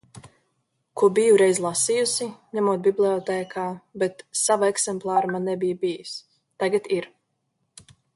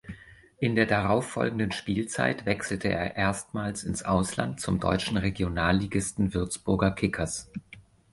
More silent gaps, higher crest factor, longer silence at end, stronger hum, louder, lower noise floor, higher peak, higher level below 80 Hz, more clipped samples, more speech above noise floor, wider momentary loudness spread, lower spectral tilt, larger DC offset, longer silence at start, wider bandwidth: neither; about the same, 18 dB vs 20 dB; first, 1.1 s vs 0.35 s; neither; first, -23 LUFS vs -28 LUFS; first, -74 dBFS vs -47 dBFS; about the same, -6 dBFS vs -8 dBFS; second, -68 dBFS vs -46 dBFS; neither; first, 52 dB vs 20 dB; first, 13 LU vs 7 LU; second, -3.5 dB/octave vs -5 dB/octave; neither; about the same, 0.15 s vs 0.05 s; about the same, 11.5 kHz vs 11.5 kHz